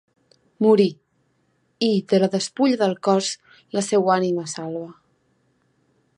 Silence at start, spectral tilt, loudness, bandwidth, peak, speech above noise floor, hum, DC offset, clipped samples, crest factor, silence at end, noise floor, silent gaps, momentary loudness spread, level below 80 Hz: 0.6 s; -5 dB/octave; -21 LUFS; 11 kHz; -4 dBFS; 47 dB; none; under 0.1%; under 0.1%; 18 dB; 1.25 s; -67 dBFS; none; 12 LU; -72 dBFS